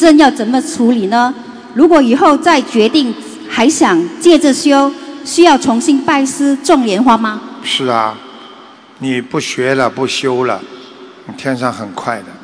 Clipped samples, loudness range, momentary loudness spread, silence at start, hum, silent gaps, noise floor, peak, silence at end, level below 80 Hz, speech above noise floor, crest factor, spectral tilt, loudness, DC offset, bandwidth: 1%; 7 LU; 13 LU; 0 s; none; none; -37 dBFS; 0 dBFS; 0.05 s; -52 dBFS; 26 dB; 12 dB; -4 dB/octave; -12 LUFS; under 0.1%; 11 kHz